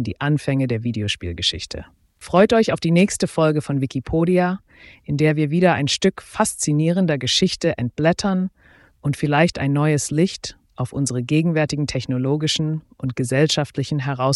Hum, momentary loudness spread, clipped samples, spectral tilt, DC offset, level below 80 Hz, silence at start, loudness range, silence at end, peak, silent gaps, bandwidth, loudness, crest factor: none; 10 LU; under 0.1%; -5 dB/octave; under 0.1%; -46 dBFS; 0 s; 2 LU; 0 s; -4 dBFS; none; 12 kHz; -20 LUFS; 16 dB